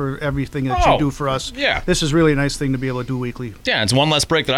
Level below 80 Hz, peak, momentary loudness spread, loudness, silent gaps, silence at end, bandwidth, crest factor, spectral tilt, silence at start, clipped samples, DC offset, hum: -32 dBFS; -4 dBFS; 8 LU; -18 LUFS; none; 0 s; 16 kHz; 14 dB; -4.5 dB/octave; 0 s; under 0.1%; under 0.1%; none